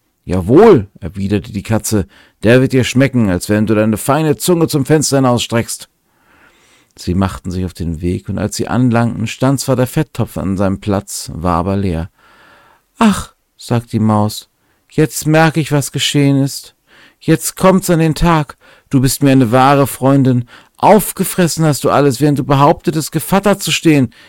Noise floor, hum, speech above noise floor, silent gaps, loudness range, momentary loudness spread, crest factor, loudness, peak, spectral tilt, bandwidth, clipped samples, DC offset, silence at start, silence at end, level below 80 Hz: -52 dBFS; none; 40 dB; none; 6 LU; 10 LU; 14 dB; -13 LUFS; 0 dBFS; -5.5 dB/octave; 17 kHz; under 0.1%; under 0.1%; 0.25 s; 0.2 s; -36 dBFS